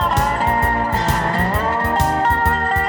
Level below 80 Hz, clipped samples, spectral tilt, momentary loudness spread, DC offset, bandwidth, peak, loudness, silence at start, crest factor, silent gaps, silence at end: -28 dBFS; under 0.1%; -5 dB/octave; 2 LU; under 0.1%; over 20 kHz; -2 dBFS; -17 LUFS; 0 s; 14 dB; none; 0 s